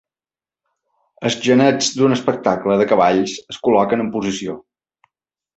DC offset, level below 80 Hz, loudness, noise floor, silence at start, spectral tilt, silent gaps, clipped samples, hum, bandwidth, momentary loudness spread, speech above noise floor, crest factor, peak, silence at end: under 0.1%; -58 dBFS; -17 LUFS; under -90 dBFS; 1.2 s; -4.5 dB/octave; none; under 0.1%; none; 8.2 kHz; 11 LU; over 74 dB; 18 dB; -2 dBFS; 1 s